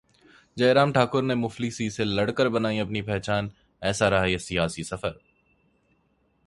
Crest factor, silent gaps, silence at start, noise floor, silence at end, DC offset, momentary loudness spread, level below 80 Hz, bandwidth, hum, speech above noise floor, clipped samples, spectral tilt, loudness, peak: 20 dB; none; 0.55 s; -68 dBFS; 1.3 s; under 0.1%; 11 LU; -50 dBFS; 11.5 kHz; none; 43 dB; under 0.1%; -5.5 dB/octave; -25 LUFS; -6 dBFS